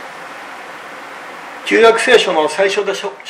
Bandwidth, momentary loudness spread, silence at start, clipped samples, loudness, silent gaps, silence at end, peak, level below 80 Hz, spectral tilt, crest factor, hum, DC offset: 13.5 kHz; 20 LU; 0 s; under 0.1%; -12 LUFS; none; 0 s; 0 dBFS; -58 dBFS; -2.5 dB/octave; 16 dB; none; under 0.1%